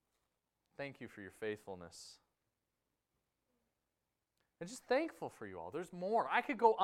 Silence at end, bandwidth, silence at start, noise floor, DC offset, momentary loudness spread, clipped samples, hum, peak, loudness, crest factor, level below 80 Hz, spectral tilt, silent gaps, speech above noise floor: 0 s; 14.5 kHz; 0.8 s; -89 dBFS; under 0.1%; 18 LU; under 0.1%; none; -16 dBFS; -40 LUFS; 26 dB; -80 dBFS; -4.5 dB/octave; none; 50 dB